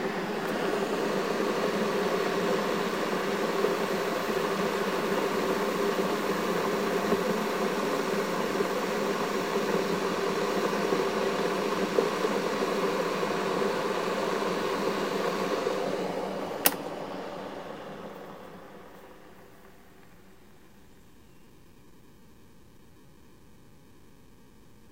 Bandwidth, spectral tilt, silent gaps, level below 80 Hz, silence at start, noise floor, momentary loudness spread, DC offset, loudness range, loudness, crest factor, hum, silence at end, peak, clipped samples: 16 kHz; -4.5 dB/octave; none; -64 dBFS; 0 s; -56 dBFS; 10 LU; 0.2%; 6 LU; -29 LUFS; 28 dB; none; 4.9 s; -2 dBFS; under 0.1%